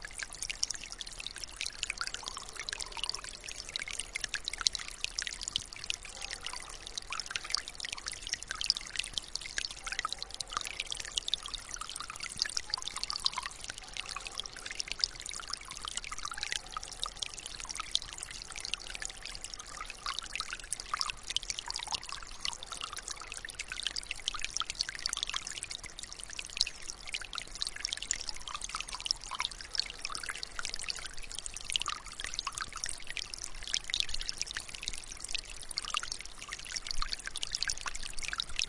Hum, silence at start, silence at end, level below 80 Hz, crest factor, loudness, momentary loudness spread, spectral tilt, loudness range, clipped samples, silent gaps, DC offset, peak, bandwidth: none; 0 s; 0 s; -52 dBFS; 34 dB; -37 LUFS; 8 LU; 1 dB/octave; 2 LU; under 0.1%; none; under 0.1%; -4 dBFS; 11.5 kHz